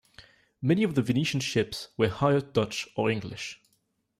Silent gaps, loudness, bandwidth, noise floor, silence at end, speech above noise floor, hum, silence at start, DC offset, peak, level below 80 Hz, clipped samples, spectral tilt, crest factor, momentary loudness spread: none; -28 LUFS; 15 kHz; -73 dBFS; 0.65 s; 46 dB; none; 0.2 s; under 0.1%; -10 dBFS; -60 dBFS; under 0.1%; -5.5 dB/octave; 18 dB; 9 LU